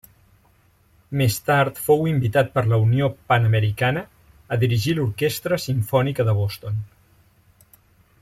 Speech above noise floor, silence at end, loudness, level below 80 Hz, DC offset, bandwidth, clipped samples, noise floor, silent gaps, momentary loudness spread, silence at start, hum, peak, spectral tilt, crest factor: 38 dB; 1.35 s; -21 LUFS; -52 dBFS; under 0.1%; 16 kHz; under 0.1%; -58 dBFS; none; 9 LU; 1.1 s; none; -6 dBFS; -6 dB/octave; 16 dB